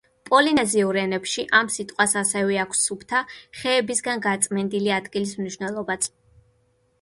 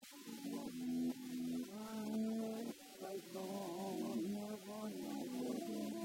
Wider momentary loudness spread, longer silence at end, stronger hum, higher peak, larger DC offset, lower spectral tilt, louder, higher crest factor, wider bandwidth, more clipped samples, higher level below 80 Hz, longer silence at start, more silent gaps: about the same, 9 LU vs 7 LU; first, 0.95 s vs 0 s; neither; first, -2 dBFS vs -32 dBFS; neither; second, -2.5 dB/octave vs -5 dB/octave; first, -22 LUFS vs -45 LUFS; first, 22 dB vs 12 dB; second, 12 kHz vs 16 kHz; neither; first, -62 dBFS vs -82 dBFS; first, 0.25 s vs 0 s; neither